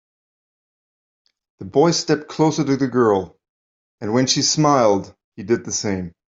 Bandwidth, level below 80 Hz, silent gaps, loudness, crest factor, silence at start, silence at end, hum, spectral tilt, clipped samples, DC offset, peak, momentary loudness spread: 7.8 kHz; -60 dBFS; 3.49-3.98 s, 5.24-5.32 s; -19 LUFS; 18 dB; 1.6 s; 0.25 s; none; -4.5 dB/octave; under 0.1%; under 0.1%; -2 dBFS; 16 LU